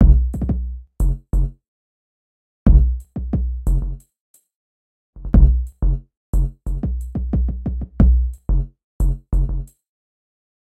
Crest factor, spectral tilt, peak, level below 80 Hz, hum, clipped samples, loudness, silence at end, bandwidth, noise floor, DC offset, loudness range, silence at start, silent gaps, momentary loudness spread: 18 dB; -10.5 dB/octave; -2 dBFS; -20 dBFS; none; under 0.1%; -21 LUFS; 1 s; 8 kHz; under -90 dBFS; under 0.1%; 2 LU; 0 s; 1.68-2.66 s, 4.20-4.34 s, 4.55-5.13 s, 6.17-6.33 s, 8.84-9.00 s; 13 LU